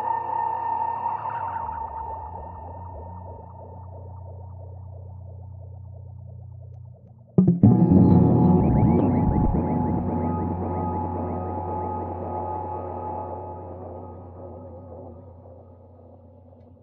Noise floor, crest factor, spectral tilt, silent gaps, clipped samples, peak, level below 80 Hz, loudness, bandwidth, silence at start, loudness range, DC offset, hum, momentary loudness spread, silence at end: -49 dBFS; 22 dB; -12 dB/octave; none; under 0.1%; -2 dBFS; -40 dBFS; -23 LUFS; 3 kHz; 0 s; 21 LU; under 0.1%; none; 24 LU; 0.3 s